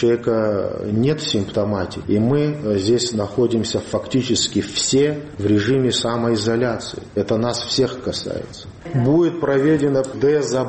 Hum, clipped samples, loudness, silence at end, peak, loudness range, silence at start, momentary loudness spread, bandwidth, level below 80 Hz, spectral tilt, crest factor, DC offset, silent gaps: none; under 0.1%; -19 LUFS; 0 s; -6 dBFS; 2 LU; 0 s; 8 LU; 8.8 kHz; -48 dBFS; -5 dB/octave; 14 dB; under 0.1%; none